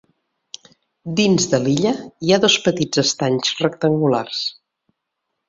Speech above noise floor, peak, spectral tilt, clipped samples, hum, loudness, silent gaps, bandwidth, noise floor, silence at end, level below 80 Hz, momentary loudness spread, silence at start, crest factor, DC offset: 59 dB; -2 dBFS; -4 dB/octave; under 0.1%; none; -18 LUFS; none; 7.8 kHz; -77 dBFS; 0.95 s; -56 dBFS; 20 LU; 1.05 s; 18 dB; under 0.1%